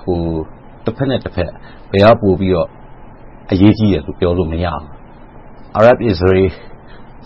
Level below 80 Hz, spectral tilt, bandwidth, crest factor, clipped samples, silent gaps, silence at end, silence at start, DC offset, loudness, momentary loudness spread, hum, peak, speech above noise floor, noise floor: -34 dBFS; -9 dB/octave; 7 kHz; 16 dB; under 0.1%; none; 0 s; 0 s; under 0.1%; -14 LUFS; 14 LU; none; 0 dBFS; 23 dB; -36 dBFS